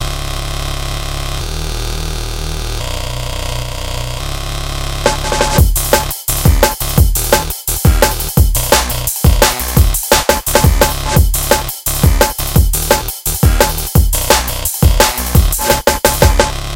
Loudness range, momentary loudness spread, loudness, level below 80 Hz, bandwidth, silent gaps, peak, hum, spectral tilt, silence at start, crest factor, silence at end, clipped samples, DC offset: 9 LU; 10 LU; -13 LUFS; -16 dBFS; 17.5 kHz; none; 0 dBFS; none; -4 dB/octave; 0 s; 12 dB; 0 s; 0.2%; under 0.1%